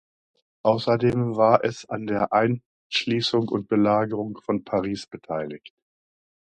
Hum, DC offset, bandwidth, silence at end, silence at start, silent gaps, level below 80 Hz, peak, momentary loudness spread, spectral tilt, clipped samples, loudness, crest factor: none; under 0.1%; 9.4 kHz; 0.8 s; 0.65 s; 2.66-2.90 s; -60 dBFS; -2 dBFS; 12 LU; -6.5 dB/octave; under 0.1%; -24 LUFS; 22 dB